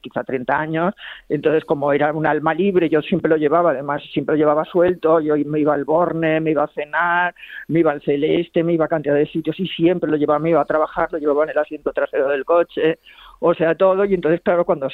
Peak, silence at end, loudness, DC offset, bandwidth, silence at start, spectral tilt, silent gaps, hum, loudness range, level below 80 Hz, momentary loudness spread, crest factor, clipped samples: -4 dBFS; 0 s; -18 LUFS; under 0.1%; 4.4 kHz; 0.05 s; -9 dB/octave; none; none; 2 LU; -54 dBFS; 6 LU; 14 dB; under 0.1%